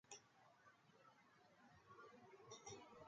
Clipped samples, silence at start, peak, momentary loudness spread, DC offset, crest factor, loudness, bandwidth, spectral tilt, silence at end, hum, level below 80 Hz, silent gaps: under 0.1%; 0.05 s; -42 dBFS; 7 LU; under 0.1%; 24 dB; -62 LUFS; 7.4 kHz; -2.5 dB/octave; 0 s; none; under -90 dBFS; none